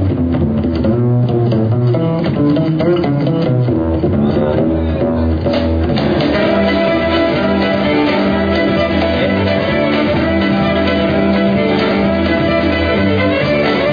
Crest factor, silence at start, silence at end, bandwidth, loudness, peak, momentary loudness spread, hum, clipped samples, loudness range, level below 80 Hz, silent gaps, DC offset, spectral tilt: 12 dB; 0 s; 0 s; 5.2 kHz; -14 LUFS; -2 dBFS; 2 LU; none; under 0.1%; 1 LU; -30 dBFS; none; 0.2%; -9 dB/octave